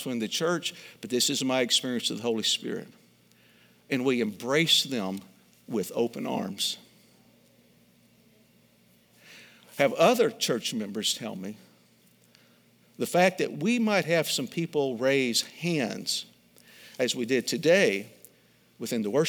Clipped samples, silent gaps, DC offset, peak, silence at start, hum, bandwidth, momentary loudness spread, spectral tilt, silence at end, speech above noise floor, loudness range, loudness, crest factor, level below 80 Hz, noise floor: under 0.1%; none; under 0.1%; -8 dBFS; 0 s; none; over 20 kHz; 13 LU; -3.5 dB/octave; 0 s; 35 dB; 8 LU; -27 LUFS; 22 dB; -80 dBFS; -62 dBFS